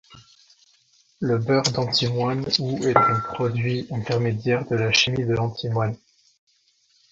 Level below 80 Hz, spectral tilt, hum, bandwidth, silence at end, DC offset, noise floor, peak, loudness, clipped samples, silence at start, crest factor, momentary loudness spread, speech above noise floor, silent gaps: -54 dBFS; -5 dB/octave; none; 7.8 kHz; 1.15 s; under 0.1%; -63 dBFS; -2 dBFS; -22 LUFS; under 0.1%; 0.1 s; 22 dB; 7 LU; 41 dB; none